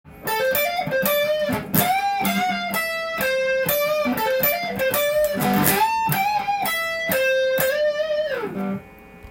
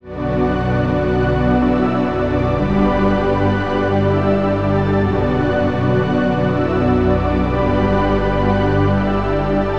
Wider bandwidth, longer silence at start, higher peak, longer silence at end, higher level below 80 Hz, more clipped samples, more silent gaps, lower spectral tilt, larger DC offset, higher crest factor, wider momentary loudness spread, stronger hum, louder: first, 17 kHz vs 7 kHz; about the same, 0.05 s vs 0 s; about the same, -2 dBFS vs -2 dBFS; about the same, 0 s vs 0 s; second, -52 dBFS vs -28 dBFS; neither; neither; second, -3.5 dB/octave vs -9 dB/octave; second, under 0.1% vs 2%; first, 20 dB vs 14 dB; first, 5 LU vs 2 LU; second, none vs 60 Hz at -45 dBFS; second, -21 LUFS vs -17 LUFS